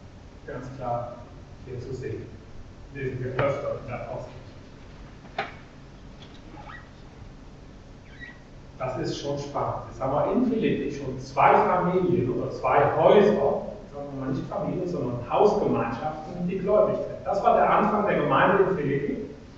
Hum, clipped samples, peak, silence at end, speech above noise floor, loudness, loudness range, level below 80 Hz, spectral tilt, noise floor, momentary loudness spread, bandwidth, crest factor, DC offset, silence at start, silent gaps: none; under 0.1%; -6 dBFS; 0 s; 21 dB; -25 LUFS; 19 LU; -48 dBFS; -7.5 dB/octave; -45 dBFS; 24 LU; 7.6 kHz; 20 dB; under 0.1%; 0 s; none